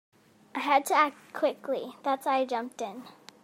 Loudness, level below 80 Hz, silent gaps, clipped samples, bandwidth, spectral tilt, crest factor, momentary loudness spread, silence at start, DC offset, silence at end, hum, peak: -29 LUFS; -88 dBFS; none; under 0.1%; 16 kHz; -2.5 dB/octave; 22 dB; 14 LU; 0.55 s; under 0.1%; 0.3 s; none; -8 dBFS